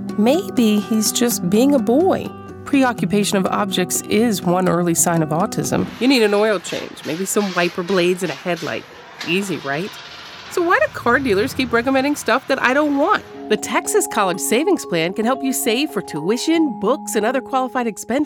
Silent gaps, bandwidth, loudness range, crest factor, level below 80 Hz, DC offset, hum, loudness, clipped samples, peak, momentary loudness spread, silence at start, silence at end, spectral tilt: none; 19.5 kHz; 4 LU; 18 dB; -54 dBFS; under 0.1%; none; -18 LUFS; under 0.1%; -2 dBFS; 8 LU; 0 s; 0 s; -4 dB/octave